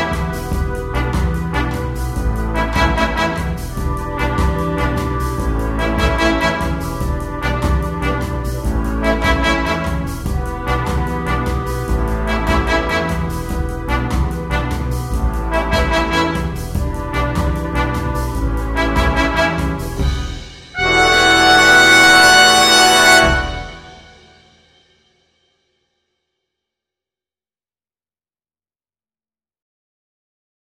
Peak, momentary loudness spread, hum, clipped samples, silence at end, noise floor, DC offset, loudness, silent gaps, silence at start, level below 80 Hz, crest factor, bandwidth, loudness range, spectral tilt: 0 dBFS; 14 LU; none; under 0.1%; 6.7 s; under -90 dBFS; under 0.1%; -15 LUFS; none; 0 s; -24 dBFS; 16 dB; 16.5 kHz; 10 LU; -3.5 dB/octave